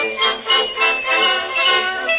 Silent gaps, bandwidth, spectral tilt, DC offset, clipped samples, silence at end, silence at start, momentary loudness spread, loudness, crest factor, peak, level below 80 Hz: none; 4 kHz; -4 dB/octave; under 0.1%; under 0.1%; 0 s; 0 s; 3 LU; -15 LUFS; 14 dB; -4 dBFS; -58 dBFS